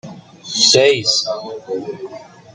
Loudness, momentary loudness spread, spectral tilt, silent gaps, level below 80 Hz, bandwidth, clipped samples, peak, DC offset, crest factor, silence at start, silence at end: -14 LUFS; 21 LU; -1.5 dB/octave; none; -64 dBFS; 9.6 kHz; under 0.1%; 0 dBFS; under 0.1%; 18 dB; 0.05 s; 0.05 s